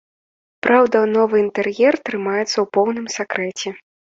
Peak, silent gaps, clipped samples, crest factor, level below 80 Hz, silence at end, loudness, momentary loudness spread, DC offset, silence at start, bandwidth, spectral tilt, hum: -2 dBFS; none; under 0.1%; 16 dB; -64 dBFS; 0.4 s; -18 LUFS; 10 LU; under 0.1%; 0.65 s; 7.8 kHz; -4 dB/octave; none